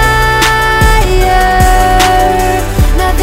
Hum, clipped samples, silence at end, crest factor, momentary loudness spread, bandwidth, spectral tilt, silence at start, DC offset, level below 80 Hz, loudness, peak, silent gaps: none; 0.4%; 0 s; 8 dB; 4 LU; 16.5 kHz; -4 dB/octave; 0 s; under 0.1%; -12 dBFS; -9 LUFS; 0 dBFS; none